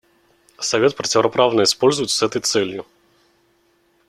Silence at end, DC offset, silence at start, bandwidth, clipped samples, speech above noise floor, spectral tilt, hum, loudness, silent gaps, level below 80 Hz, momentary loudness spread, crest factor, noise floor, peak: 1.25 s; under 0.1%; 0.6 s; 14 kHz; under 0.1%; 43 dB; -3 dB/octave; none; -18 LUFS; none; -62 dBFS; 9 LU; 18 dB; -61 dBFS; -2 dBFS